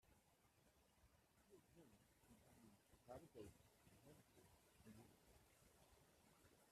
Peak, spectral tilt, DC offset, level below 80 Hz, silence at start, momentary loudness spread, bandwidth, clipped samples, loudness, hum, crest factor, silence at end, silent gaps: -46 dBFS; -5 dB/octave; under 0.1%; -84 dBFS; 0 s; 7 LU; 14 kHz; under 0.1%; -65 LUFS; none; 24 dB; 0 s; none